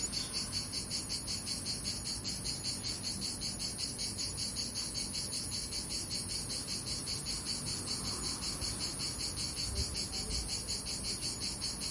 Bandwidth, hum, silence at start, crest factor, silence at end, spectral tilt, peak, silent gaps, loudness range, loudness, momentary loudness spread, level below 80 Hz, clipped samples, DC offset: 11.5 kHz; none; 0 s; 18 dB; 0 s; -2 dB/octave; -22 dBFS; none; 0 LU; -36 LUFS; 1 LU; -50 dBFS; under 0.1%; under 0.1%